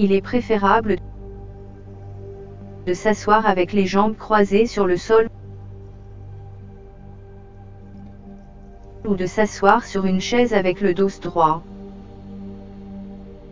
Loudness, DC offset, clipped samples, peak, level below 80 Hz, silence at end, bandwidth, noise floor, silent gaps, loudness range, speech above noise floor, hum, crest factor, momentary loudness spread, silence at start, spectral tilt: -19 LUFS; under 0.1%; under 0.1%; 0 dBFS; -42 dBFS; 0 s; 7.6 kHz; -40 dBFS; none; 14 LU; 22 dB; none; 22 dB; 23 LU; 0 s; -6 dB/octave